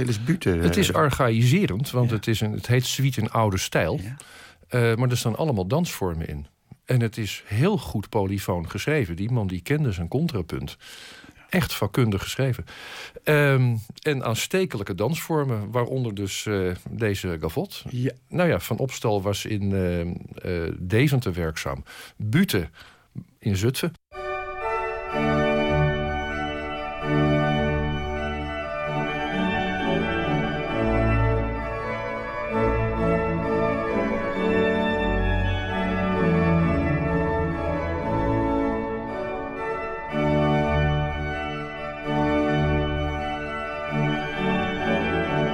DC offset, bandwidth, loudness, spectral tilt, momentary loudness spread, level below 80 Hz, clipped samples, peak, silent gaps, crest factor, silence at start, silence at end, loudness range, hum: under 0.1%; 17 kHz; -25 LUFS; -6 dB/octave; 9 LU; -38 dBFS; under 0.1%; -10 dBFS; none; 14 dB; 0 s; 0 s; 3 LU; none